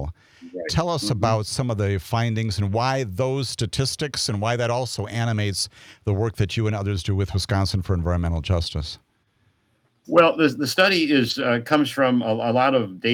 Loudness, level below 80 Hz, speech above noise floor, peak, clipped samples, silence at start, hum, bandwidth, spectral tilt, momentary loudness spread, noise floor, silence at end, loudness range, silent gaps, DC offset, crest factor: -22 LUFS; -44 dBFS; 44 dB; -4 dBFS; under 0.1%; 0 s; none; 16.5 kHz; -5 dB/octave; 8 LU; -66 dBFS; 0 s; 5 LU; none; under 0.1%; 18 dB